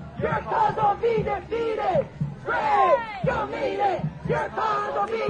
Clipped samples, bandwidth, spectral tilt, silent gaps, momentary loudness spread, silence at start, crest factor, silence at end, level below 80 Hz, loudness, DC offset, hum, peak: under 0.1%; 9.6 kHz; -7 dB/octave; none; 7 LU; 0 s; 16 dB; 0 s; -48 dBFS; -24 LUFS; under 0.1%; none; -8 dBFS